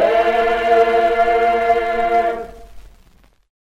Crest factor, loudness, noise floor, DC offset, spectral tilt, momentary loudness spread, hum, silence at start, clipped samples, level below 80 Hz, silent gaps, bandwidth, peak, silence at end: 14 dB; -16 LUFS; -51 dBFS; under 0.1%; -4.5 dB/octave; 7 LU; none; 0 s; under 0.1%; -42 dBFS; none; 10.5 kHz; -2 dBFS; 0.85 s